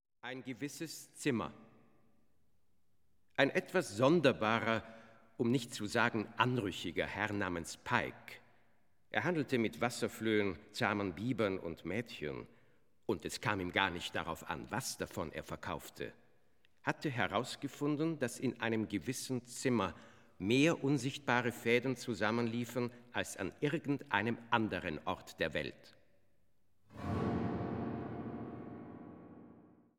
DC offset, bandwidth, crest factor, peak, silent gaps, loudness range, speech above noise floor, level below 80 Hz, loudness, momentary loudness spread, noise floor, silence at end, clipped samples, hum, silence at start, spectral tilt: under 0.1%; 17.5 kHz; 24 dB; -12 dBFS; none; 7 LU; 44 dB; -66 dBFS; -37 LUFS; 13 LU; -81 dBFS; 0.35 s; under 0.1%; none; 0.25 s; -5 dB/octave